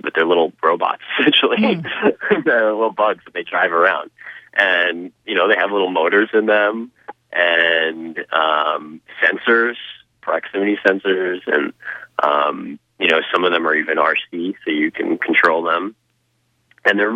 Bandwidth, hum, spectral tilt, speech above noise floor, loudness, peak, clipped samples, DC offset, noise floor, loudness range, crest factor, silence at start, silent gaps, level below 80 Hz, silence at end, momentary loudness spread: 8 kHz; none; -5.5 dB/octave; 48 dB; -17 LUFS; 0 dBFS; under 0.1%; under 0.1%; -65 dBFS; 2 LU; 18 dB; 0.05 s; none; -68 dBFS; 0 s; 12 LU